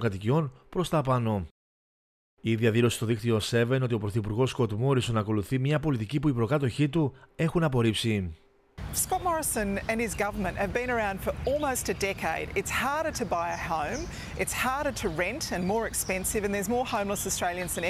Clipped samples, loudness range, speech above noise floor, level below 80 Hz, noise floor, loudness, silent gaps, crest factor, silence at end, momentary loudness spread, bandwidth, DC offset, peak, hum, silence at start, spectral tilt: under 0.1%; 2 LU; over 62 dB; -48 dBFS; under -90 dBFS; -28 LUFS; 1.51-2.37 s; 18 dB; 0 s; 5 LU; 16 kHz; under 0.1%; -12 dBFS; none; 0 s; -5 dB/octave